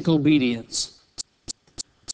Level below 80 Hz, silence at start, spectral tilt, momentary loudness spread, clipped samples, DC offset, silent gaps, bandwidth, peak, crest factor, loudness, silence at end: -58 dBFS; 0 s; -4.5 dB/octave; 17 LU; under 0.1%; under 0.1%; none; 8 kHz; -10 dBFS; 16 dB; -23 LUFS; 0 s